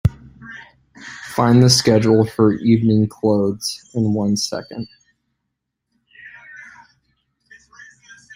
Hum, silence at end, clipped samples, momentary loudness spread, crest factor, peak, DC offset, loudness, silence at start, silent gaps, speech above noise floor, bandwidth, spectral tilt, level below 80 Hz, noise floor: none; 0.5 s; under 0.1%; 26 LU; 18 dB; 0 dBFS; under 0.1%; -16 LUFS; 0.05 s; none; 61 dB; 16 kHz; -5.5 dB/octave; -46 dBFS; -77 dBFS